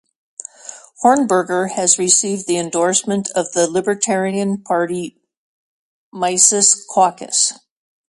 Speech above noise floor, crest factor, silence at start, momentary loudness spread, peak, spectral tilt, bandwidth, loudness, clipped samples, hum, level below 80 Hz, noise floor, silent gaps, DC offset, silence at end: 22 dB; 18 dB; 0.65 s; 20 LU; 0 dBFS; -2.5 dB/octave; 11.5 kHz; -15 LUFS; under 0.1%; none; -66 dBFS; -39 dBFS; 5.37-6.12 s; under 0.1%; 0.55 s